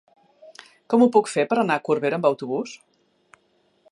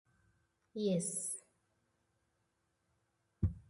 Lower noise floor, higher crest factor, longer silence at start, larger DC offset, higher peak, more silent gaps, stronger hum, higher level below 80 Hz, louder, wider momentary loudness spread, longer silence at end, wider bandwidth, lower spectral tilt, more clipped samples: second, -65 dBFS vs -81 dBFS; about the same, 20 dB vs 20 dB; first, 0.9 s vs 0.75 s; neither; first, -4 dBFS vs -22 dBFS; neither; neither; second, -78 dBFS vs -54 dBFS; first, -21 LUFS vs -38 LUFS; about the same, 11 LU vs 11 LU; first, 1.15 s vs 0.1 s; about the same, 11.5 kHz vs 12 kHz; about the same, -5.5 dB/octave vs -5.5 dB/octave; neither